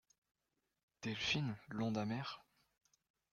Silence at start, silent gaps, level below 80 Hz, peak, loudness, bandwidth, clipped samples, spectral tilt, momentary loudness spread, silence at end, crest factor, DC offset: 1 s; none; -72 dBFS; -24 dBFS; -41 LUFS; 7.2 kHz; under 0.1%; -5 dB/octave; 11 LU; 0.9 s; 20 dB; under 0.1%